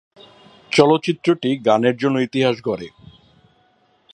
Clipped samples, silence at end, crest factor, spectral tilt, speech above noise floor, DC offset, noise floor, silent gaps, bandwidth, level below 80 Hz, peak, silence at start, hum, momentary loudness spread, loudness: under 0.1%; 1.25 s; 20 dB; -6 dB/octave; 42 dB; under 0.1%; -59 dBFS; none; 11 kHz; -62 dBFS; 0 dBFS; 0.7 s; none; 11 LU; -18 LUFS